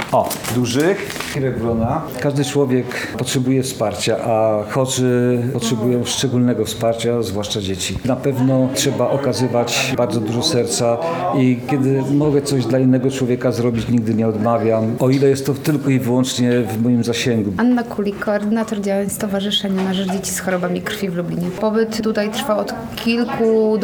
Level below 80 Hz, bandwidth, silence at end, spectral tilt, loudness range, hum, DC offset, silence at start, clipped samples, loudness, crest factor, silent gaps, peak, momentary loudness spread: -48 dBFS; over 20 kHz; 0 s; -5.5 dB/octave; 3 LU; none; under 0.1%; 0 s; under 0.1%; -18 LUFS; 16 dB; none; -2 dBFS; 5 LU